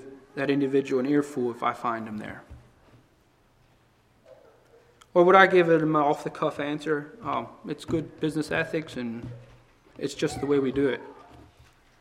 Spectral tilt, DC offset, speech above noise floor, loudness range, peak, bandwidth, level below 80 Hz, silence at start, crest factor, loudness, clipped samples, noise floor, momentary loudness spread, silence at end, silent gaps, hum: -6 dB/octave; under 0.1%; 37 dB; 12 LU; -2 dBFS; 13 kHz; -58 dBFS; 0 s; 26 dB; -25 LUFS; under 0.1%; -62 dBFS; 18 LU; 0.85 s; none; none